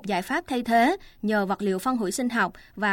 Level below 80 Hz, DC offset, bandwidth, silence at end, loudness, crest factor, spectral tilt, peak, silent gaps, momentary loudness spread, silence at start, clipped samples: -56 dBFS; under 0.1%; 17 kHz; 0 s; -25 LUFS; 16 dB; -4.5 dB/octave; -10 dBFS; none; 7 LU; 0.05 s; under 0.1%